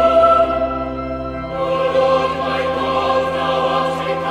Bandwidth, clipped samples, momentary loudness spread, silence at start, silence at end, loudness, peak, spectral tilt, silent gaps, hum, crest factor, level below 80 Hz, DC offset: 11 kHz; under 0.1%; 11 LU; 0 s; 0 s; -17 LUFS; -2 dBFS; -6 dB/octave; none; none; 16 dB; -38 dBFS; under 0.1%